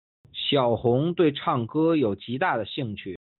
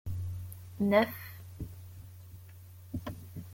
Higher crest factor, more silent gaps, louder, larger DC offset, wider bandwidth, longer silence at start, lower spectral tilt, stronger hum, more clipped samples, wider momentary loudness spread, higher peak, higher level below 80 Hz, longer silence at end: second, 16 dB vs 24 dB; neither; first, -24 LUFS vs -34 LUFS; neither; second, 4.3 kHz vs 17 kHz; first, 0.35 s vs 0.05 s; second, -4.5 dB/octave vs -7 dB/octave; neither; neither; second, 10 LU vs 24 LU; about the same, -10 dBFS vs -12 dBFS; about the same, -60 dBFS vs -56 dBFS; first, 0.25 s vs 0 s